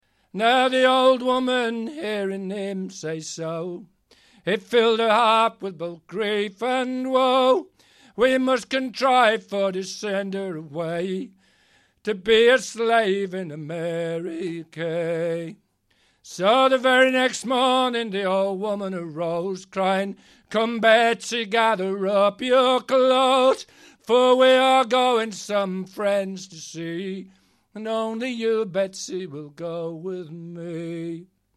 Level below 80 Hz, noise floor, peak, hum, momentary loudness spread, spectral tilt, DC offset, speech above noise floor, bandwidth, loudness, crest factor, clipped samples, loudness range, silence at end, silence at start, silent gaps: -66 dBFS; -65 dBFS; -4 dBFS; none; 15 LU; -4 dB/octave; under 0.1%; 43 dB; 12.5 kHz; -22 LUFS; 20 dB; under 0.1%; 9 LU; 0.35 s; 0.35 s; none